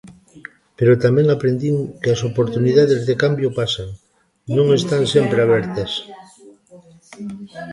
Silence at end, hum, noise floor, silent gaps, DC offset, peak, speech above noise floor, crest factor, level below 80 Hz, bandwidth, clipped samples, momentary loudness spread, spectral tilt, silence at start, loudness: 0 s; none; -46 dBFS; none; under 0.1%; -2 dBFS; 29 dB; 16 dB; -50 dBFS; 11.5 kHz; under 0.1%; 18 LU; -6.5 dB/octave; 0.05 s; -17 LUFS